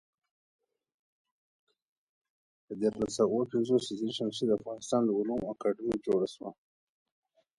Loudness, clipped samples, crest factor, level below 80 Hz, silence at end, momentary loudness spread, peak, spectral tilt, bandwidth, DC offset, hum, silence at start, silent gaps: -31 LUFS; under 0.1%; 18 dB; -68 dBFS; 1.05 s; 6 LU; -14 dBFS; -5.5 dB/octave; 11.5 kHz; under 0.1%; none; 2.7 s; none